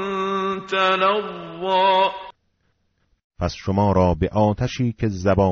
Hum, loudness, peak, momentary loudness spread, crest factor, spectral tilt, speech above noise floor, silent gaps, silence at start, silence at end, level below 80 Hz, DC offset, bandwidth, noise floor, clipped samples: none; -20 LUFS; -6 dBFS; 10 LU; 16 dB; -4.5 dB/octave; 48 dB; 3.24-3.30 s; 0 s; 0 s; -40 dBFS; under 0.1%; 7.4 kHz; -68 dBFS; under 0.1%